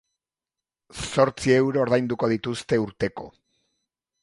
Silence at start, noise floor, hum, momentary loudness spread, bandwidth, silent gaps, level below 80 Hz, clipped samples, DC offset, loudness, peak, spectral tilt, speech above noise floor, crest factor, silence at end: 0.95 s; -90 dBFS; none; 17 LU; 11.5 kHz; none; -54 dBFS; under 0.1%; under 0.1%; -23 LUFS; -4 dBFS; -5.5 dB/octave; 67 dB; 22 dB; 0.95 s